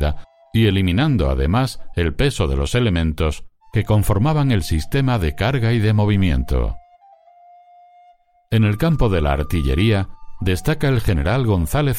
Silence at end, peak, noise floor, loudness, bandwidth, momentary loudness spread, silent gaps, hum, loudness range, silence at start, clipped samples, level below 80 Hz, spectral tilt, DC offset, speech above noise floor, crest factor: 0 s; -4 dBFS; -53 dBFS; -19 LUFS; 16.5 kHz; 7 LU; none; none; 3 LU; 0 s; under 0.1%; -26 dBFS; -6.5 dB/octave; under 0.1%; 36 dB; 14 dB